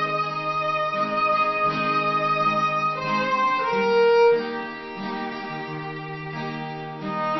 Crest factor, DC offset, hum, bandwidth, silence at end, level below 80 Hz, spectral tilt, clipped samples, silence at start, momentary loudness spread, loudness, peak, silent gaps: 14 dB; under 0.1%; none; 6 kHz; 0 s; -62 dBFS; -6 dB/octave; under 0.1%; 0 s; 13 LU; -23 LUFS; -8 dBFS; none